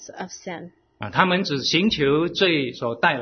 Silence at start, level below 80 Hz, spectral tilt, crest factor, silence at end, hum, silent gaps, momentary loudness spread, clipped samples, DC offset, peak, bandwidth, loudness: 0 s; -54 dBFS; -4.5 dB/octave; 22 dB; 0 s; none; none; 16 LU; under 0.1%; under 0.1%; 0 dBFS; 6.6 kHz; -21 LUFS